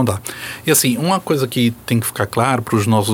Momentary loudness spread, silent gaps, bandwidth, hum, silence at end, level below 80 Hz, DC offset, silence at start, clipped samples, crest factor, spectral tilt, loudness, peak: 7 LU; none; 17.5 kHz; none; 0 s; -52 dBFS; under 0.1%; 0 s; under 0.1%; 16 dB; -4.5 dB/octave; -17 LUFS; -2 dBFS